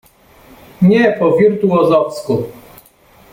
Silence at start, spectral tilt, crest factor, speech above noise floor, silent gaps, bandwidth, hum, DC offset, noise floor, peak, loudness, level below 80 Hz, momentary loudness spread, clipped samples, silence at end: 0.8 s; -8 dB/octave; 12 dB; 35 dB; none; 16 kHz; none; under 0.1%; -47 dBFS; -2 dBFS; -13 LUFS; -52 dBFS; 9 LU; under 0.1%; 0.8 s